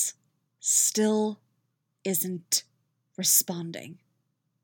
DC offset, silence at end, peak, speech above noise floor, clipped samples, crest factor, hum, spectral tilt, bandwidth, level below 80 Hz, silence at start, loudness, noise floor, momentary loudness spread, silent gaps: under 0.1%; 0.7 s; -8 dBFS; 50 dB; under 0.1%; 22 dB; none; -2.5 dB/octave; over 20 kHz; under -90 dBFS; 0 s; -25 LUFS; -76 dBFS; 15 LU; none